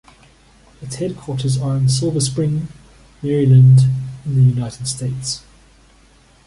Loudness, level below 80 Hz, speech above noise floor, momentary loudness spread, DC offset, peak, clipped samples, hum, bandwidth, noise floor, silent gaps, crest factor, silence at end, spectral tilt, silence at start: -17 LUFS; -46 dBFS; 35 dB; 16 LU; under 0.1%; -2 dBFS; under 0.1%; none; 11.5 kHz; -50 dBFS; none; 16 dB; 1.1 s; -6.5 dB/octave; 0.8 s